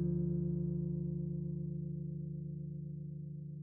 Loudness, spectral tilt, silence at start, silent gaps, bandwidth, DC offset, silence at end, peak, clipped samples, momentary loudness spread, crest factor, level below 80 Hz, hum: -40 LUFS; -16.5 dB/octave; 0 s; none; 1 kHz; under 0.1%; 0 s; -26 dBFS; under 0.1%; 9 LU; 12 dB; -56 dBFS; none